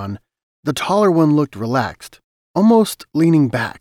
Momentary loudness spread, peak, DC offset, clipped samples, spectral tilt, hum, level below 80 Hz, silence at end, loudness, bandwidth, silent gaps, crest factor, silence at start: 13 LU; -4 dBFS; under 0.1%; under 0.1%; -6.5 dB/octave; none; -54 dBFS; 0.1 s; -16 LUFS; 16 kHz; 0.43-0.63 s, 2.24-2.54 s; 14 dB; 0 s